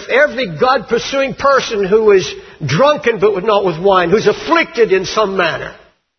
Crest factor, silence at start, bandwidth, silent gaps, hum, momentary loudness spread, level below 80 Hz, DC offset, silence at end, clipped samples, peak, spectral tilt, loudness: 14 dB; 0 s; 6.6 kHz; none; none; 6 LU; -46 dBFS; under 0.1%; 0.45 s; under 0.1%; 0 dBFS; -4.5 dB/octave; -13 LUFS